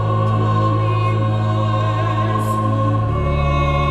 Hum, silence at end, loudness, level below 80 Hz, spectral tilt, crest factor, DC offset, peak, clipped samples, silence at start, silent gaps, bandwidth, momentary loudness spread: none; 0 s; -18 LUFS; -28 dBFS; -8 dB/octave; 12 dB; under 0.1%; -6 dBFS; under 0.1%; 0 s; none; 10 kHz; 2 LU